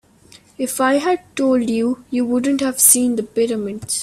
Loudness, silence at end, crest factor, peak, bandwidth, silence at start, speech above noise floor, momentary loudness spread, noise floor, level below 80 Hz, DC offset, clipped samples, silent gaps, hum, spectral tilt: -17 LUFS; 0 s; 18 dB; 0 dBFS; 16 kHz; 0.6 s; 30 dB; 11 LU; -48 dBFS; -58 dBFS; under 0.1%; under 0.1%; none; none; -2.5 dB/octave